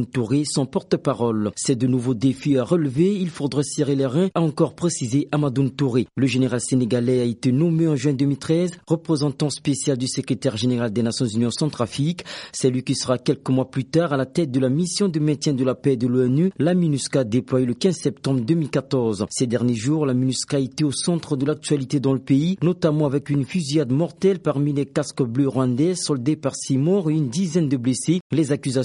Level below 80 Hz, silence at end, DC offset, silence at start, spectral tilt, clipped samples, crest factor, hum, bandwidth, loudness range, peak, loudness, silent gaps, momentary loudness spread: -58 dBFS; 0 s; under 0.1%; 0 s; -6 dB/octave; under 0.1%; 16 dB; none; 11.5 kHz; 2 LU; -4 dBFS; -21 LUFS; 28.21-28.30 s; 4 LU